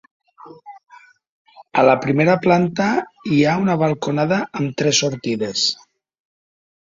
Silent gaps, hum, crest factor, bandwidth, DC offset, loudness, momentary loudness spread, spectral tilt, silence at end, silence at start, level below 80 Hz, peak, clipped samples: 1.29-1.45 s; none; 18 dB; 7.8 kHz; under 0.1%; -18 LUFS; 8 LU; -4.5 dB/octave; 1.2 s; 0.45 s; -58 dBFS; -2 dBFS; under 0.1%